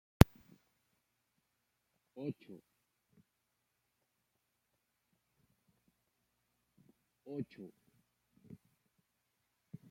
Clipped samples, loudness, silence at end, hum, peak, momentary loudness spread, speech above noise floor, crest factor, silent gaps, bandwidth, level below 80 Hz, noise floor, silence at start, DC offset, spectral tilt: under 0.1%; -34 LUFS; 2.45 s; 60 Hz at -85 dBFS; -2 dBFS; 29 LU; 38 dB; 38 dB; none; 16.5 kHz; -50 dBFS; -84 dBFS; 2.2 s; under 0.1%; -6.5 dB/octave